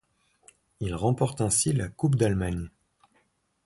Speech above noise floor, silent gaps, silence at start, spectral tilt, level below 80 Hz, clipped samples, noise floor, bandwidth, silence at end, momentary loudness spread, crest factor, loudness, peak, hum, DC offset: 44 dB; none; 0.8 s; -5.5 dB/octave; -46 dBFS; under 0.1%; -70 dBFS; 11.5 kHz; 1 s; 12 LU; 18 dB; -27 LUFS; -10 dBFS; none; under 0.1%